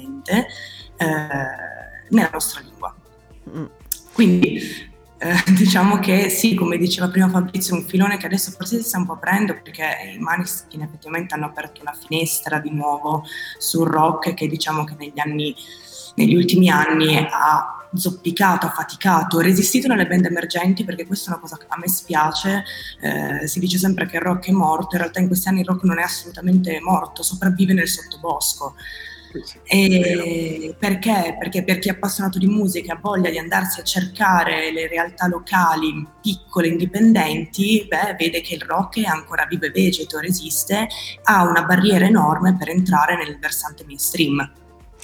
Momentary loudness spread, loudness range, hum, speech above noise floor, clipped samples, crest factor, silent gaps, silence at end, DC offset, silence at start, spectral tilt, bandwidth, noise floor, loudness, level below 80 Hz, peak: 13 LU; 6 LU; none; 28 dB; under 0.1%; 18 dB; none; 0.55 s; under 0.1%; 0 s; -4.5 dB/octave; over 20 kHz; -47 dBFS; -19 LUFS; -50 dBFS; -2 dBFS